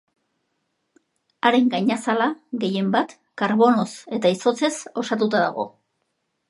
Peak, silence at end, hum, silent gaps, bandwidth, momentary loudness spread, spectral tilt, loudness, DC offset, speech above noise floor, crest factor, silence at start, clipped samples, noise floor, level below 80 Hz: -2 dBFS; 0.8 s; none; none; 11.5 kHz; 9 LU; -5 dB/octave; -22 LUFS; under 0.1%; 54 dB; 22 dB; 1.45 s; under 0.1%; -74 dBFS; -76 dBFS